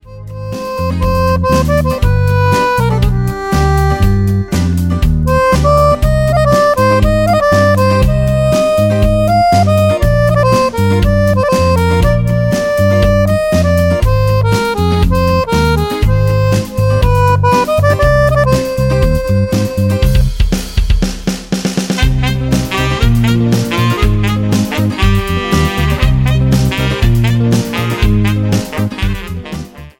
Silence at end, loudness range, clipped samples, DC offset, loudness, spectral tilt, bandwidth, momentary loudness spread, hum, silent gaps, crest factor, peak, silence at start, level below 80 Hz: 0.1 s; 3 LU; under 0.1%; under 0.1%; -12 LUFS; -6.5 dB/octave; 17 kHz; 6 LU; none; none; 10 dB; 0 dBFS; 0.05 s; -18 dBFS